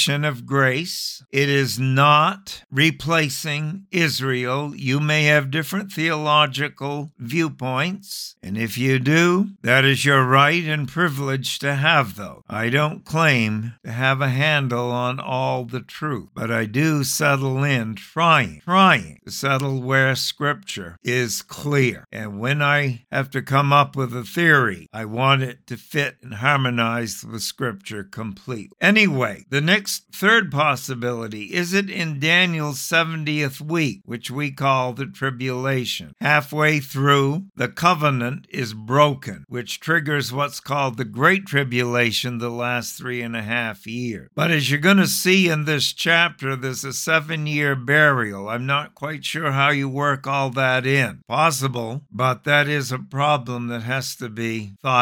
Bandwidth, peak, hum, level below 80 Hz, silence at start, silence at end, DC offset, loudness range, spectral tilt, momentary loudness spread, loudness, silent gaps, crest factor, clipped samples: 19 kHz; -2 dBFS; none; -62 dBFS; 0 s; 0 s; under 0.1%; 4 LU; -4.5 dB/octave; 12 LU; -20 LUFS; none; 20 dB; under 0.1%